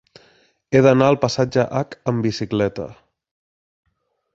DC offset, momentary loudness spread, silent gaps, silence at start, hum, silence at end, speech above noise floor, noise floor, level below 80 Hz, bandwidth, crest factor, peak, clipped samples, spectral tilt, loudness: under 0.1%; 10 LU; none; 0.7 s; none; 1.4 s; 39 dB; -57 dBFS; -52 dBFS; 7.8 kHz; 20 dB; 0 dBFS; under 0.1%; -6.5 dB/octave; -19 LUFS